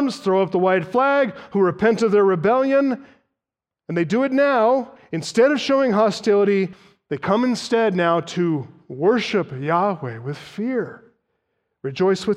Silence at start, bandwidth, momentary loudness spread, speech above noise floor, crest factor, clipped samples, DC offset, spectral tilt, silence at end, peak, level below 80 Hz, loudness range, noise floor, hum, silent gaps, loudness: 0 s; 10.5 kHz; 12 LU; 68 dB; 14 dB; under 0.1%; under 0.1%; -6 dB/octave; 0 s; -6 dBFS; -64 dBFS; 5 LU; -87 dBFS; none; none; -20 LUFS